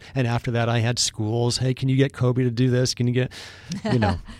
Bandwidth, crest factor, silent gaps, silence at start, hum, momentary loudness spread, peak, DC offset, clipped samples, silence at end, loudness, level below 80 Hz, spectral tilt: 13.5 kHz; 16 dB; none; 0 s; none; 5 LU; -8 dBFS; under 0.1%; under 0.1%; 0 s; -22 LUFS; -46 dBFS; -5.5 dB/octave